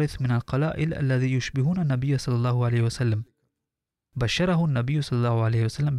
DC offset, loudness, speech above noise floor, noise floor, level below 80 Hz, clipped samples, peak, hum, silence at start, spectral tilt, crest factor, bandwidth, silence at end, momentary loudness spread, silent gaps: under 0.1%; -25 LUFS; 63 dB; -87 dBFS; -48 dBFS; under 0.1%; -12 dBFS; none; 0 s; -7 dB/octave; 12 dB; 11.5 kHz; 0 s; 4 LU; none